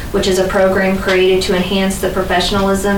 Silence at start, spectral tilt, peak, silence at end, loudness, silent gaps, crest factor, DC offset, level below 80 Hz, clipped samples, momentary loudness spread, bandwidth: 0 s; -4.5 dB/octave; -2 dBFS; 0 s; -14 LUFS; none; 10 dB; under 0.1%; -28 dBFS; under 0.1%; 3 LU; 19 kHz